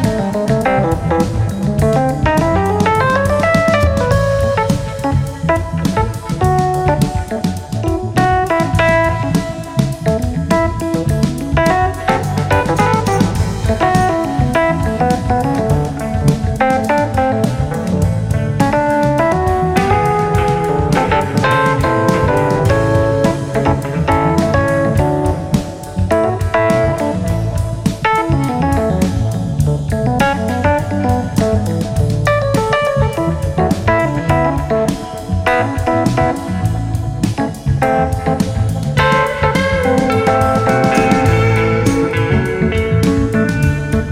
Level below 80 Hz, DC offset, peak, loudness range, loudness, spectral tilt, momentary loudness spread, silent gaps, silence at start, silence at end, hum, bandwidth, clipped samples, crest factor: -28 dBFS; under 0.1%; 0 dBFS; 3 LU; -15 LUFS; -6.5 dB/octave; 5 LU; none; 0 s; 0 s; none; 16 kHz; under 0.1%; 14 dB